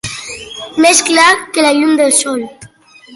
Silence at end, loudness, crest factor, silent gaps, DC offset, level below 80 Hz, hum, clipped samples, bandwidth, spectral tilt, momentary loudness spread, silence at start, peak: 0 s; -10 LUFS; 12 dB; none; under 0.1%; -52 dBFS; none; under 0.1%; 12 kHz; -1.5 dB/octave; 17 LU; 0.05 s; 0 dBFS